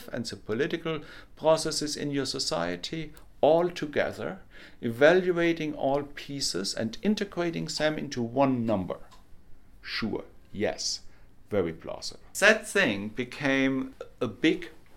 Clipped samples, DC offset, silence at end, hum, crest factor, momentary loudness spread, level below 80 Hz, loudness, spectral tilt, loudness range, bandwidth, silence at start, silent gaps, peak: under 0.1%; under 0.1%; 0 s; none; 26 dB; 14 LU; -54 dBFS; -28 LUFS; -4 dB/octave; 5 LU; 16.5 kHz; 0 s; none; -4 dBFS